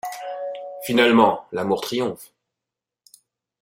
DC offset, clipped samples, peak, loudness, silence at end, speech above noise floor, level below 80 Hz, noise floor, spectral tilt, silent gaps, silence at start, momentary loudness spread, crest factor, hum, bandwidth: under 0.1%; under 0.1%; -2 dBFS; -21 LUFS; 1.35 s; 67 dB; -64 dBFS; -86 dBFS; -4.5 dB/octave; none; 0.05 s; 16 LU; 22 dB; none; 16.5 kHz